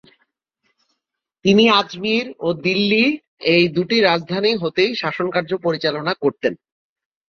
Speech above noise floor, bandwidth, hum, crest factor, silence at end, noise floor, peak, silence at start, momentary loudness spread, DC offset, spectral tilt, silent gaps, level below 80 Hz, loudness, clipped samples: 61 dB; 6.8 kHz; none; 18 dB; 0.75 s; -79 dBFS; -2 dBFS; 1.45 s; 8 LU; under 0.1%; -5.5 dB/octave; 3.28-3.37 s; -60 dBFS; -18 LUFS; under 0.1%